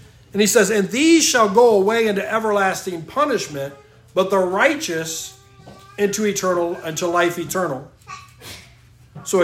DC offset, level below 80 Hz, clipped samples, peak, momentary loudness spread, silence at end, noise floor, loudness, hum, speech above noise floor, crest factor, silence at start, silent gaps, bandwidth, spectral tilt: under 0.1%; -58 dBFS; under 0.1%; 0 dBFS; 22 LU; 0 s; -48 dBFS; -18 LUFS; none; 30 dB; 18 dB; 0.35 s; none; 16 kHz; -3.5 dB/octave